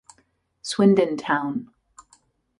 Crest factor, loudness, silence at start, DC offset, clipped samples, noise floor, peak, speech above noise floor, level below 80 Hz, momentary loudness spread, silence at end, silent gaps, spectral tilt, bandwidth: 20 dB; -22 LUFS; 0.65 s; under 0.1%; under 0.1%; -66 dBFS; -6 dBFS; 45 dB; -66 dBFS; 15 LU; 0.95 s; none; -6 dB/octave; 11 kHz